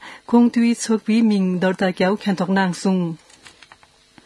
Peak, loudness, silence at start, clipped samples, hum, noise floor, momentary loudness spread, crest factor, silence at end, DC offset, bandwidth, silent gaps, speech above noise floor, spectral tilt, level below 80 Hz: -2 dBFS; -19 LUFS; 0 s; under 0.1%; none; -52 dBFS; 5 LU; 16 dB; 1.1 s; under 0.1%; 12 kHz; none; 34 dB; -6 dB/octave; -64 dBFS